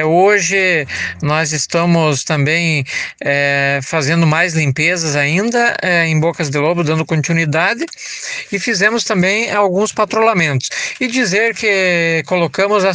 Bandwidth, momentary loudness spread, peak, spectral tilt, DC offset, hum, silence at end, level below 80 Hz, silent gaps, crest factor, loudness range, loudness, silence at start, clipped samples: 10 kHz; 6 LU; 0 dBFS; -4.5 dB/octave; under 0.1%; none; 0 s; -56 dBFS; none; 14 dB; 1 LU; -14 LUFS; 0 s; under 0.1%